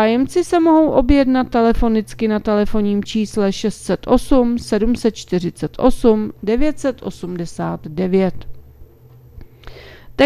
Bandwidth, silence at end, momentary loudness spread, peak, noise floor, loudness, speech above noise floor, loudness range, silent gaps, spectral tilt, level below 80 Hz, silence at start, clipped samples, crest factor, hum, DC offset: 14.5 kHz; 0 s; 11 LU; 0 dBFS; -44 dBFS; -17 LUFS; 28 dB; 7 LU; none; -6.5 dB/octave; -32 dBFS; 0 s; under 0.1%; 16 dB; none; under 0.1%